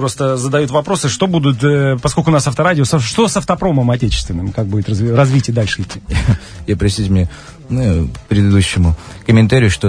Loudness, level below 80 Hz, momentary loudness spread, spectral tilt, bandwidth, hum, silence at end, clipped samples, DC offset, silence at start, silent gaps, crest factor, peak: -14 LUFS; -28 dBFS; 7 LU; -6 dB/octave; 11 kHz; none; 0 s; under 0.1%; under 0.1%; 0 s; none; 14 dB; 0 dBFS